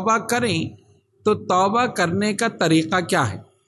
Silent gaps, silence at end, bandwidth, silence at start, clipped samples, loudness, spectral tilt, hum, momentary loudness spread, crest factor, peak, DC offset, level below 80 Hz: none; 0.25 s; 12.5 kHz; 0 s; under 0.1%; -20 LUFS; -4.5 dB/octave; none; 7 LU; 18 dB; -4 dBFS; under 0.1%; -54 dBFS